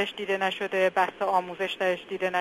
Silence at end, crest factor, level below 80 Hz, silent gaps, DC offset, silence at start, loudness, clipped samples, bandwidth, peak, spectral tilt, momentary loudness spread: 0 s; 18 dB; -74 dBFS; none; under 0.1%; 0 s; -27 LUFS; under 0.1%; 14 kHz; -10 dBFS; -4 dB/octave; 4 LU